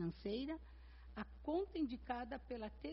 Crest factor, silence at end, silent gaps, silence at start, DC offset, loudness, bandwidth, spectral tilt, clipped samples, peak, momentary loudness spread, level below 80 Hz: 18 dB; 0 s; none; 0 s; under 0.1%; -46 LUFS; 5.8 kHz; -5.5 dB/octave; under 0.1%; -28 dBFS; 11 LU; -58 dBFS